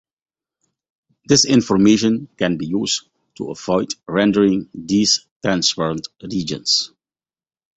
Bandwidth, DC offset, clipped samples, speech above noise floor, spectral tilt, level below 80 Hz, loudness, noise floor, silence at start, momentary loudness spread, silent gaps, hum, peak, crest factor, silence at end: 8.2 kHz; under 0.1%; under 0.1%; over 72 dB; -4 dB/octave; -52 dBFS; -18 LUFS; under -90 dBFS; 1.3 s; 12 LU; 5.31-5.40 s; none; -2 dBFS; 18 dB; 0.9 s